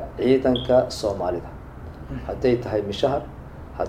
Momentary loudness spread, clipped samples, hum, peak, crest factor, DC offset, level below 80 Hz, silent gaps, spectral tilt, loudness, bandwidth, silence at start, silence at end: 20 LU; under 0.1%; none; -6 dBFS; 18 dB; under 0.1%; -40 dBFS; none; -6.5 dB/octave; -23 LUFS; 15 kHz; 0 s; 0 s